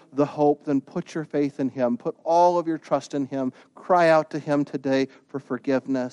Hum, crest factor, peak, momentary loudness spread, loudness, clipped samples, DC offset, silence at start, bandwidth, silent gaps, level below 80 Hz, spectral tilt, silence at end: none; 16 dB; -8 dBFS; 11 LU; -24 LUFS; under 0.1%; under 0.1%; 0.15 s; 10.5 kHz; none; -72 dBFS; -6.5 dB/octave; 0 s